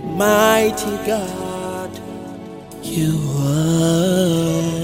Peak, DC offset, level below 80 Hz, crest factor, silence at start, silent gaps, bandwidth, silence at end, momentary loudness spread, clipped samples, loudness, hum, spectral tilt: -2 dBFS; under 0.1%; -44 dBFS; 16 dB; 0 s; none; 16.5 kHz; 0 s; 17 LU; under 0.1%; -18 LUFS; none; -5.5 dB/octave